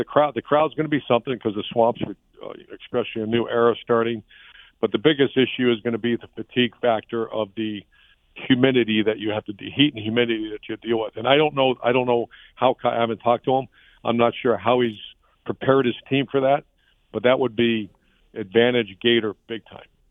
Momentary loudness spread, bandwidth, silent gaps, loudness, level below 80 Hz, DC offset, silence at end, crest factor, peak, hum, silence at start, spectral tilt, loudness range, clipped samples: 15 LU; 3.9 kHz; none; -22 LUFS; -60 dBFS; under 0.1%; 0.35 s; 20 dB; -2 dBFS; none; 0 s; -9 dB/octave; 2 LU; under 0.1%